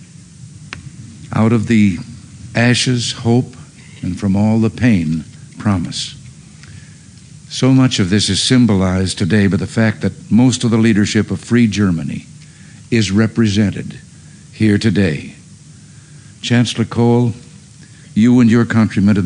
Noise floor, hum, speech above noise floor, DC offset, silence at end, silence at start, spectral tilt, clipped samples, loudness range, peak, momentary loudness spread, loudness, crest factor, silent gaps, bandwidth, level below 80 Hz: -39 dBFS; none; 26 dB; under 0.1%; 0 s; 0 s; -5.5 dB/octave; under 0.1%; 5 LU; -2 dBFS; 16 LU; -14 LUFS; 12 dB; none; 10.5 kHz; -46 dBFS